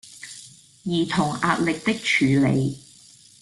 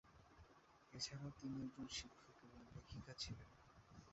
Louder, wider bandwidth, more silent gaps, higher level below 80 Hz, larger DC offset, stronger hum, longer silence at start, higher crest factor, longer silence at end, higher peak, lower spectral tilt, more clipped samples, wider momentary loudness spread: first, -22 LUFS vs -52 LUFS; first, 12.5 kHz vs 8 kHz; neither; first, -56 dBFS vs -70 dBFS; neither; neither; about the same, 0.05 s vs 0.05 s; about the same, 18 dB vs 22 dB; first, 0.65 s vs 0 s; first, -6 dBFS vs -34 dBFS; first, -5.5 dB/octave vs -4 dB/octave; neither; about the same, 19 LU vs 18 LU